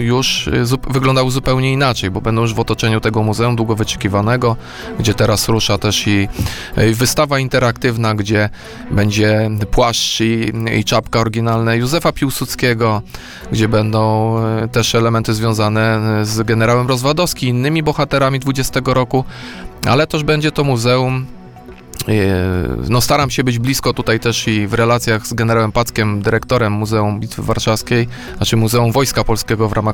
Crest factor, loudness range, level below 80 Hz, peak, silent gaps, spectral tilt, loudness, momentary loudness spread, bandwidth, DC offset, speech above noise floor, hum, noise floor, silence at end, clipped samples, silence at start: 14 dB; 2 LU; -32 dBFS; -2 dBFS; none; -5 dB/octave; -15 LUFS; 5 LU; 18.5 kHz; 0.5%; 21 dB; none; -35 dBFS; 0 s; under 0.1%; 0 s